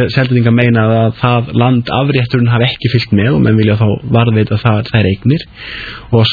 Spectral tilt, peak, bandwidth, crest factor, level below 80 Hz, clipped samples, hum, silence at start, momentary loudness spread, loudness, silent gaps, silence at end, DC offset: -9 dB/octave; 0 dBFS; 4.9 kHz; 10 dB; -38 dBFS; under 0.1%; none; 0 s; 5 LU; -11 LUFS; none; 0 s; under 0.1%